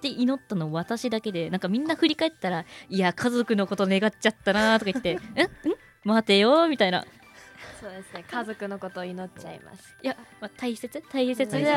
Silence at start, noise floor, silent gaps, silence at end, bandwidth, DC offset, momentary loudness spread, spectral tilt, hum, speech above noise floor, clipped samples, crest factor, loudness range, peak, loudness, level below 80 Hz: 0 s; -47 dBFS; none; 0 s; 15.5 kHz; under 0.1%; 19 LU; -5 dB/octave; none; 22 dB; under 0.1%; 18 dB; 12 LU; -8 dBFS; -26 LUFS; -62 dBFS